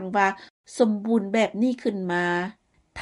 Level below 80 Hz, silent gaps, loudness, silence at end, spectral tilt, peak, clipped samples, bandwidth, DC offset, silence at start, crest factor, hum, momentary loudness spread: -70 dBFS; 0.50-0.64 s; -24 LUFS; 0 s; -5.5 dB/octave; -8 dBFS; under 0.1%; 11.5 kHz; under 0.1%; 0 s; 18 dB; none; 15 LU